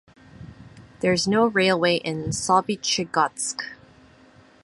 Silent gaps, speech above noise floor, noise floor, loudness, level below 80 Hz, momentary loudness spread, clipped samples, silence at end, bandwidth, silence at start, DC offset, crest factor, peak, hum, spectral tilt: none; 30 dB; -53 dBFS; -22 LUFS; -56 dBFS; 9 LU; under 0.1%; 0.9 s; 11.5 kHz; 0.4 s; under 0.1%; 20 dB; -6 dBFS; none; -3.5 dB/octave